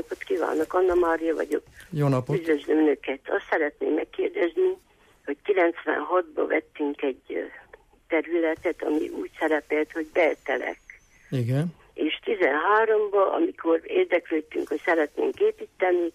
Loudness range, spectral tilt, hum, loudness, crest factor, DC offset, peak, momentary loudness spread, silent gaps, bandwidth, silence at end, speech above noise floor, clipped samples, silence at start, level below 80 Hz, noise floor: 4 LU; -7 dB/octave; none; -25 LUFS; 14 dB; under 0.1%; -12 dBFS; 9 LU; none; 14 kHz; 0.05 s; 25 dB; under 0.1%; 0.1 s; -60 dBFS; -50 dBFS